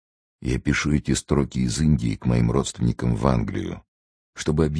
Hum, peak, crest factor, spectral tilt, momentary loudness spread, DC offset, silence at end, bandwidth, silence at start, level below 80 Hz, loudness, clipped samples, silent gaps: none; -2 dBFS; 20 dB; -6 dB/octave; 9 LU; under 0.1%; 0 s; 11 kHz; 0.4 s; -34 dBFS; -23 LUFS; under 0.1%; 3.88-4.33 s